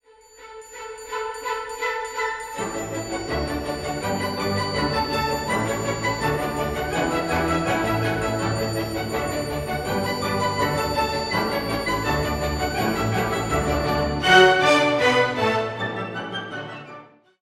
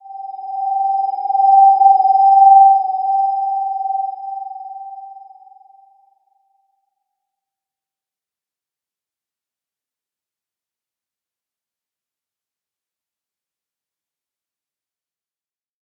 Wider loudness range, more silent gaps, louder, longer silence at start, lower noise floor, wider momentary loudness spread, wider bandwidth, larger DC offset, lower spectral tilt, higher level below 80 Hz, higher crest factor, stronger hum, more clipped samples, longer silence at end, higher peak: second, 8 LU vs 18 LU; neither; second, -23 LUFS vs -13 LUFS; first, 0.4 s vs 0.05 s; second, -47 dBFS vs under -90 dBFS; second, 11 LU vs 23 LU; first, 16.5 kHz vs 5.2 kHz; neither; about the same, -4.5 dB/octave vs -5 dB/octave; first, -40 dBFS vs under -90 dBFS; about the same, 22 dB vs 18 dB; neither; neither; second, 0.35 s vs 10.85 s; about the same, -2 dBFS vs -2 dBFS